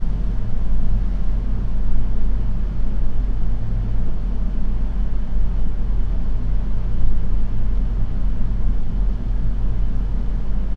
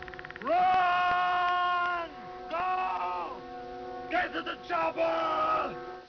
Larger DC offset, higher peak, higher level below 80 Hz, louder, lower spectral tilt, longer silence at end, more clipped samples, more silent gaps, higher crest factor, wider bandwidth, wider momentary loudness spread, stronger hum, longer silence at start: neither; first, -4 dBFS vs -18 dBFS; first, -18 dBFS vs -60 dBFS; first, -26 LUFS vs -29 LUFS; first, -9.5 dB/octave vs -4.5 dB/octave; about the same, 0 s vs 0 s; neither; neither; about the same, 12 dB vs 12 dB; second, 2 kHz vs 5.4 kHz; second, 2 LU vs 15 LU; neither; about the same, 0 s vs 0 s